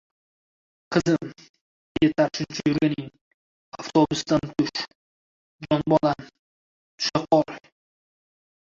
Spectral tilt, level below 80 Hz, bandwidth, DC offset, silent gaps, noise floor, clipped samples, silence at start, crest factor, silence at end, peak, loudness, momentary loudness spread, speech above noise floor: -5.5 dB/octave; -58 dBFS; 7.6 kHz; under 0.1%; 1.49-1.54 s, 1.61-1.95 s, 3.21-3.72 s, 4.95-5.59 s, 6.39-6.98 s; under -90 dBFS; under 0.1%; 0.9 s; 22 dB; 1.15 s; -4 dBFS; -24 LUFS; 16 LU; over 67 dB